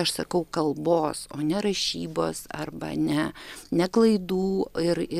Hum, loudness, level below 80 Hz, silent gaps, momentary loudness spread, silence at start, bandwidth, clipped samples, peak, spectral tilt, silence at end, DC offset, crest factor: none; -26 LUFS; -54 dBFS; none; 10 LU; 0 s; 15.5 kHz; under 0.1%; -8 dBFS; -5 dB/octave; 0 s; under 0.1%; 16 dB